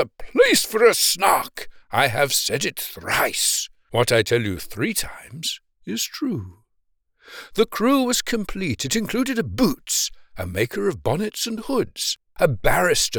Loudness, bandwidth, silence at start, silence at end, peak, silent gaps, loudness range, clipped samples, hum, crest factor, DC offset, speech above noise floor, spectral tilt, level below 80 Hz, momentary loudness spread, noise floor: -21 LUFS; over 20 kHz; 0 s; 0 s; -4 dBFS; none; 6 LU; under 0.1%; none; 18 dB; under 0.1%; 47 dB; -3 dB/octave; -42 dBFS; 13 LU; -68 dBFS